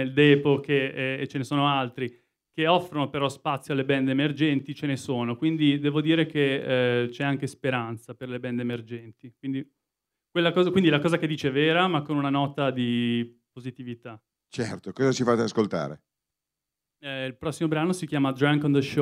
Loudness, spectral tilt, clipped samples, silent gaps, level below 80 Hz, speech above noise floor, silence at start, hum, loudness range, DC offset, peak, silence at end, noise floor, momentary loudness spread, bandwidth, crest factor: -25 LUFS; -6 dB/octave; under 0.1%; none; -68 dBFS; 62 dB; 0 s; none; 5 LU; under 0.1%; -6 dBFS; 0 s; -87 dBFS; 14 LU; 13 kHz; 20 dB